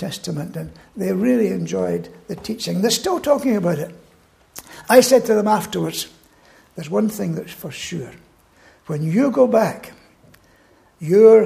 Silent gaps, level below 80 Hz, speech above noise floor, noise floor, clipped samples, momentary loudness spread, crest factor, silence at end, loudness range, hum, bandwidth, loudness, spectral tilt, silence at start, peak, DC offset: none; -56 dBFS; 36 dB; -54 dBFS; under 0.1%; 19 LU; 20 dB; 0 s; 6 LU; none; 15.5 kHz; -19 LUFS; -5 dB/octave; 0 s; 0 dBFS; under 0.1%